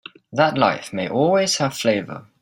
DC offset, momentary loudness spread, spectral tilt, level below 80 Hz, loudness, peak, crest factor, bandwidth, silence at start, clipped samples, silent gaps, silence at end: under 0.1%; 9 LU; -4 dB/octave; -62 dBFS; -20 LUFS; -2 dBFS; 18 dB; 16 kHz; 0.3 s; under 0.1%; none; 0.2 s